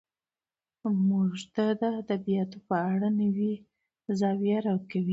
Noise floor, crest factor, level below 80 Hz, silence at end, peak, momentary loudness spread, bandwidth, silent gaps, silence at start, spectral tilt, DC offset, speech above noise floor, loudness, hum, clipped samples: under -90 dBFS; 14 dB; -72 dBFS; 0 s; -14 dBFS; 6 LU; 7.8 kHz; none; 0.85 s; -8 dB/octave; under 0.1%; over 62 dB; -29 LUFS; none; under 0.1%